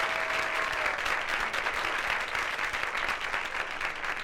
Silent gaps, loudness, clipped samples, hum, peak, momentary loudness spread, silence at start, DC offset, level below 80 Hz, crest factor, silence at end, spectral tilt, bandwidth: none; -29 LUFS; under 0.1%; none; -14 dBFS; 4 LU; 0 s; under 0.1%; -52 dBFS; 18 dB; 0 s; -1.5 dB/octave; 17.5 kHz